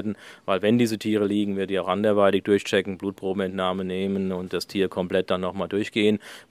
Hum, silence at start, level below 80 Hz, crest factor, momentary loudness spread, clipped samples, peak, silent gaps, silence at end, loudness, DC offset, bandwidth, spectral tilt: none; 0 s; -66 dBFS; 20 dB; 8 LU; under 0.1%; -6 dBFS; none; 0.1 s; -24 LUFS; under 0.1%; 15.5 kHz; -6 dB/octave